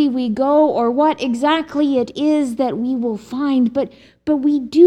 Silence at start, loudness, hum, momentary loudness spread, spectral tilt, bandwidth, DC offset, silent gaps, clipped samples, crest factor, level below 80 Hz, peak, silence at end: 0 s; -18 LUFS; none; 7 LU; -6 dB/octave; 10.5 kHz; under 0.1%; none; under 0.1%; 16 dB; -56 dBFS; 0 dBFS; 0 s